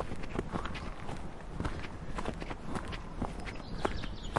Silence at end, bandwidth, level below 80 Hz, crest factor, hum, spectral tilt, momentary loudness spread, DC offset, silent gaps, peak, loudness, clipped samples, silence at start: 0 s; 11.5 kHz; -44 dBFS; 26 dB; none; -6 dB/octave; 6 LU; under 0.1%; none; -12 dBFS; -40 LUFS; under 0.1%; 0 s